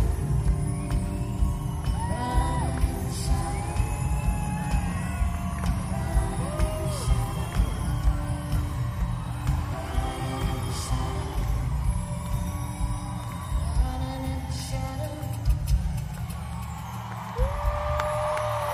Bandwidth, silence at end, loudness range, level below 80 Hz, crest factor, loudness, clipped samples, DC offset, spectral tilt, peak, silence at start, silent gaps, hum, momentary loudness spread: 15.5 kHz; 0 s; 3 LU; -30 dBFS; 16 dB; -29 LUFS; under 0.1%; under 0.1%; -6 dB/octave; -10 dBFS; 0 s; none; none; 5 LU